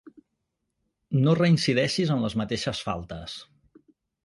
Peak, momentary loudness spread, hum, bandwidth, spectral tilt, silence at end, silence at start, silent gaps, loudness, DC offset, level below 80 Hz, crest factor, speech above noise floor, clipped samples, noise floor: -10 dBFS; 16 LU; none; 11.5 kHz; -6 dB/octave; 0.8 s; 1.1 s; none; -25 LUFS; under 0.1%; -54 dBFS; 16 dB; 55 dB; under 0.1%; -80 dBFS